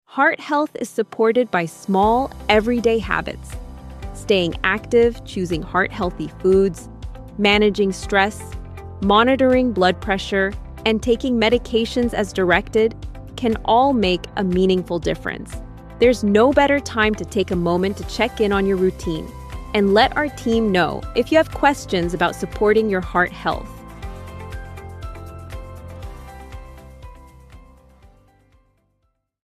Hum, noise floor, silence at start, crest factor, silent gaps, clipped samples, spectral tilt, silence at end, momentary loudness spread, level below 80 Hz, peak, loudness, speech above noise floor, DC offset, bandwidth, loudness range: none; -69 dBFS; 0.1 s; 18 dB; none; under 0.1%; -5.5 dB/octave; 1.85 s; 20 LU; -36 dBFS; -2 dBFS; -19 LUFS; 51 dB; under 0.1%; 14.5 kHz; 9 LU